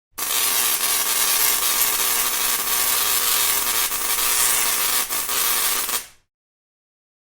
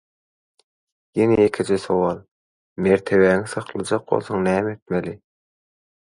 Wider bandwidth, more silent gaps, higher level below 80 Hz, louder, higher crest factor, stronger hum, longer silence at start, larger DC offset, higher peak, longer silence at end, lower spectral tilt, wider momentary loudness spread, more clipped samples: first, over 20 kHz vs 11.5 kHz; second, none vs 2.31-2.76 s, 4.82-4.86 s; about the same, -52 dBFS vs -52 dBFS; first, -17 LUFS vs -21 LUFS; about the same, 20 dB vs 18 dB; neither; second, 0.2 s vs 1.15 s; neither; about the same, -2 dBFS vs -4 dBFS; first, 1.3 s vs 0.9 s; second, 2 dB/octave vs -6.5 dB/octave; second, 4 LU vs 13 LU; neither